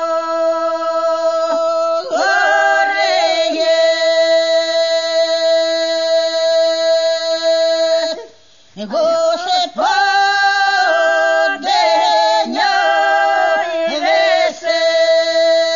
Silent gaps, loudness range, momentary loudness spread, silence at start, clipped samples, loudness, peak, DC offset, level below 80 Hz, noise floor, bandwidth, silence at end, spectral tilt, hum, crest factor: none; 3 LU; 4 LU; 0 s; under 0.1%; -14 LUFS; -2 dBFS; 0.4%; -68 dBFS; -47 dBFS; 7.4 kHz; 0 s; -0.5 dB/octave; none; 12 dB